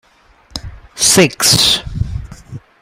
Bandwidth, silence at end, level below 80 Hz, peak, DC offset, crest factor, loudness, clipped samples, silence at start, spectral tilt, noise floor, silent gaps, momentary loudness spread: over 20 kHz; 0.25 s; -32 dBFS; 0 dBFS; under 0.1%; 16 dB; -11 LUFS; under 0.1%; 0.55 s; -2.5 dB/octave; -49 dBFS; none; 20 LU